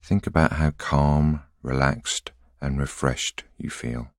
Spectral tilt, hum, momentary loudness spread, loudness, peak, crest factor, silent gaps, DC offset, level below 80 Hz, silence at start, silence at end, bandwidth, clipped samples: -5.5 dB/octave; none; 12 LU; -24 LUFS; -2 dBFS; 22 dB; none; under 0.1%; -34 dBFS; 0.05 s; 0.1 s; 13 kHz; under 0.1%